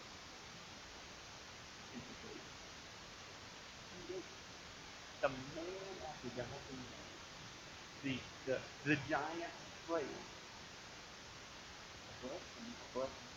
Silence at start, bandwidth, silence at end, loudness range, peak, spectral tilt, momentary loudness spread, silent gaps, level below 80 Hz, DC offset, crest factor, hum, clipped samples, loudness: 0 s; 17 kHz; 0 s; 9 LU; -20 dBFS; -4 dB/octave; 11 LU; none; -68 dBFS; under 0.1%; 26 dB; none; under 0.1%; -47 LUFS